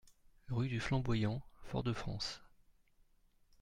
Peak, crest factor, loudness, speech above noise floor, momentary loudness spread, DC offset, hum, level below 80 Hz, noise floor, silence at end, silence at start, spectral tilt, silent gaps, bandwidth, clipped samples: -22 dBFS; 18 dB; -39 LUFS; 33 dB; 8 LU; under 0.1%; none; -54 dBFS; -70 dBFS; 1.15 s; 0.05 s; -6 dB/octave; none; 11 kHz; under 0.1%